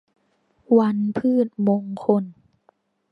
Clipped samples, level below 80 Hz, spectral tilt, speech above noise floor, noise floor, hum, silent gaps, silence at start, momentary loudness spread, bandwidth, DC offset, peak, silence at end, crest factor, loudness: under 0.1%; -68 dBFS; -10 dB/octave; 46 dB; -65 dBFS; none; none; 0.7 s; 5 LU; 5 kHz; under 0.1%; -4 dBFS; 0.8 s; 18 dB; -21 LUFS